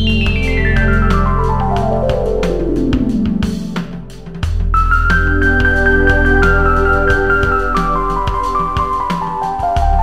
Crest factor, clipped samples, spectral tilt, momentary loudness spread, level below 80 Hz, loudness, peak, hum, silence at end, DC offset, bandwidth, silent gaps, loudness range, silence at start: 12 dB; under 0.1%; -7 dB/octave; 8 LU; -18 dBFS; -14 LUFS; 0 dBFS; none; 0 s; 4%; 9.6 kHz; none; 4 LU; 0 s